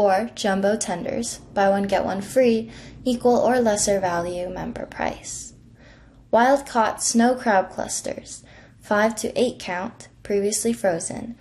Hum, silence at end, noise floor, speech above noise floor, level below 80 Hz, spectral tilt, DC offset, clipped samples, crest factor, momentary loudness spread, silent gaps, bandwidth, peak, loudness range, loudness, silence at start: none; 0.05 s; -49 dBFS; 27 dB; -50 dBFS; -3.5 dB/octave; under 0.1%; under 0.1%; 16 dB; 13 LU; none; 13.5 kHz; -6 dBFS; 3 LU; -22 LUFS; 0 s